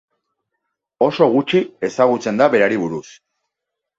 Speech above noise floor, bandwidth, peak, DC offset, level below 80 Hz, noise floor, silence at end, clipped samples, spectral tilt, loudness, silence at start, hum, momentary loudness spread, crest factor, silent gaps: 65 dB; 7.8 kHz; -2 dBFS; under 0.1%; -62 dBFS; -81 dBFS; 0.95 s; under 0.1%; -6 dB/octave; -17 LUFS; 1 s; none; 9 LU; 18 dB; none